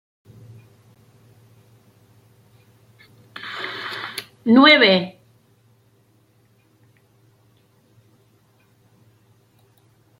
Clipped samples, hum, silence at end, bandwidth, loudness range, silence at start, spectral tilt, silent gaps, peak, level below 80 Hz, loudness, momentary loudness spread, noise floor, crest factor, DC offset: under 0.1%; none; 5.1 s; 16 kHz; 17 LU; 3.45 s; -5 dB/octave; none; 0 dBFS; -70 dBFS; -16 LUFS; 24 LU; -59 dBFS; 24 dB; under 0.1%